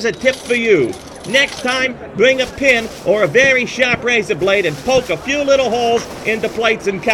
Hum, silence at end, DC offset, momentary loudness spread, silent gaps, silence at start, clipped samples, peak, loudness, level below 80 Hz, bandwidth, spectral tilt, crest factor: none; 0 s; under 0.1%; 6 LU; none; 0 s; under 0.1%; 0 dBFS; -15 LUFS; -44 dBFS; 15.5 kHz; -3.5 dB/octave; 16 dB